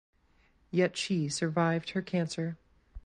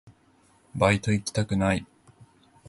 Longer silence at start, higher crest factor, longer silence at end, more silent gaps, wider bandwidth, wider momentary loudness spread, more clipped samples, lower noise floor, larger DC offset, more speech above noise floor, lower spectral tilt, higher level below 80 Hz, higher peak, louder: first, 0.75 s vs 0.05 s; about the same, 18 dB vs 22 dB; second, 0.05 s vs 0.85 s; neither; about the same, 11.5 kHz vs 11.5 kHz; about the same, 7 LU vs 7 LU; neither; first, -67 dBFS vs -61 dBFS; neither; about the same, 36 dB vs 37 dB; about the same, -5.5 dB/octave vs -5.5 dB/octave; second, -58 dBFS vs -48 dBFS; second, -14 dBFS vs -6 dBFS; second, -31 LUFS vs -25 LUFS